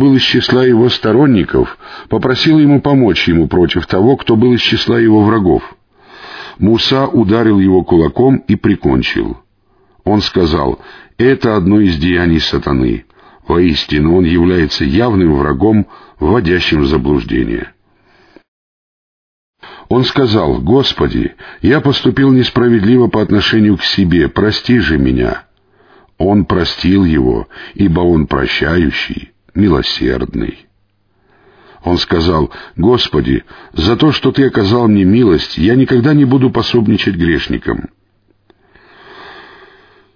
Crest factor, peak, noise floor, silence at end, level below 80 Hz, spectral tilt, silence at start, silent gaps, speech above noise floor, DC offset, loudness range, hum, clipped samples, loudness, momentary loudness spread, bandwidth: 12 dB; 0 dBFS; -58 dBFS; 0.75 s; -30 dBFS; -7.5 dB/octave; 0 s; 18.48-19.53 s; 47 dB; under 0.1%; 5 LU; none; under 0.1%; -11 LUFS; 9 LU; 5.4 kHz